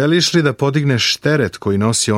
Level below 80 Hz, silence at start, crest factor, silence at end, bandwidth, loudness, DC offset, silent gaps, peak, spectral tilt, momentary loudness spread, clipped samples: -52 dBFS; 0 s; 14 dB; 0 s; 16 kHz; -15 LUFS; under 0.1%; none; -2 dBFS; -4.5 dB/octave; 4 LU; under 0.1%